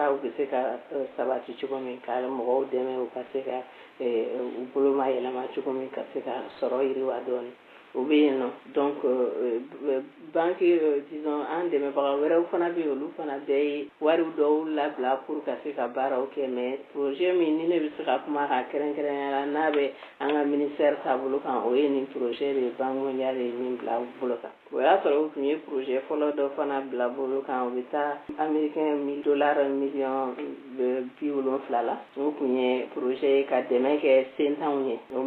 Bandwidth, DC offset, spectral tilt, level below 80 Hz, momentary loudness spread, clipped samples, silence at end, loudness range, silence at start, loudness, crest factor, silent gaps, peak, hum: 4.4 kHz; under 0.1%; -7.5 dB/octave; -80 dBFS; 9 LU; under 0.1%; 0 s; 3 LU; 0 s; -28 LUFS; 18 dB; none; -8 dBFS; none